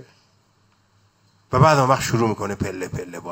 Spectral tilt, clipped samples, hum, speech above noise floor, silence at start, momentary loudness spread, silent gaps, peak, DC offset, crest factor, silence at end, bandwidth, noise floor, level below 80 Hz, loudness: -6 dB/octave; under 0.1%; none; 42 dB; 1.5 s; 15 LU; none; -2 dBFS; under 0.1%; 20 dB; 0 s; 16.5 kHz; -61 dBFS; -48 dBFS; -20 LUFS